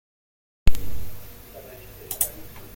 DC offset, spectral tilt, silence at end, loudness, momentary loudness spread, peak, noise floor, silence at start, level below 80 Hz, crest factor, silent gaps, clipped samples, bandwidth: under 0.1%; -3.5 dB/octave; 0.15 s; -29 LUFS; 17 LU; -2 dBFS; -43 dBFS; 0.65 s; -32 dBFS; 20 dB; none; under 0.1%; 17 kHz